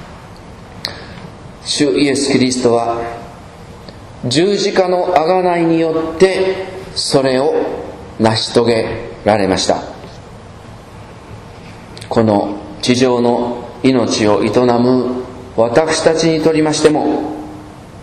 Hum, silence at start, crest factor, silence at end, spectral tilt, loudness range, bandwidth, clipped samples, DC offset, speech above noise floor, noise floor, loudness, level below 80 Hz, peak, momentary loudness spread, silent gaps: none; 0 s; 16 dB; 0 s; -5 dB/octave; 5 LU; 12.5 kHz; 0.1%; under 0.1%; 21 dB; -34 dBFS; -14 LUFS; -42 dBFS; 0 dBFS; 22 LU; none